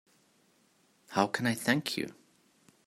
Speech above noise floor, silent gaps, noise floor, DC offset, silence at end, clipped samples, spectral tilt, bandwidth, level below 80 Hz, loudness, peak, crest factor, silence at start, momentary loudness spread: 38 dB; none; -68 dBFS; under 0.1%; 0.75 s; under 0.1%; -4.5 dB/octave; 16 kHz; -76 dBFS; -31 LUFS; -10 dBFS; 26 dB; 1.1 s; 8 LU